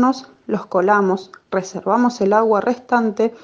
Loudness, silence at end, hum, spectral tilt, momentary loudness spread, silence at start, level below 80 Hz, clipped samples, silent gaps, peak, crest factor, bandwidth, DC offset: -18 LUFS; 0.05 s; none; -6 dB/octave; 10 LU; 0 s; -64 dBFS; under 0.1%; none; -2 dBFS; 16 dB; 7.6 kHz; under 0.1%